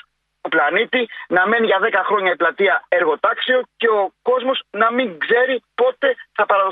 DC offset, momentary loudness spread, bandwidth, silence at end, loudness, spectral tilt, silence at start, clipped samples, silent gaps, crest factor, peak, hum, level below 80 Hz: under 0.1%; 5 LU; 4.6 kHz; 0 s; -18 LUFS; -6.5 dB/octave; 0.45 s; under 0.1%; none; 16 dB; -2 dBFS; none; -72 dBFS